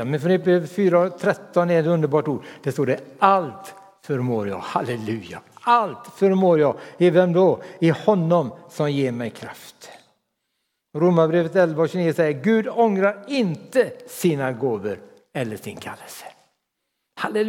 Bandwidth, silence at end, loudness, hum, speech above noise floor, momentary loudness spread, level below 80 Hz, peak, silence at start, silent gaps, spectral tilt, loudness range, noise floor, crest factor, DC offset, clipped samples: 16.5 kHz; 0 s; -21 LUFS; none; 57 dB; 16 LU; -72 dBFS; -2 dBFS; 0 s; none; -7 dB/octave; 6 LU; -77 dBFS; 20 dB; under 0.1%; under 0.1%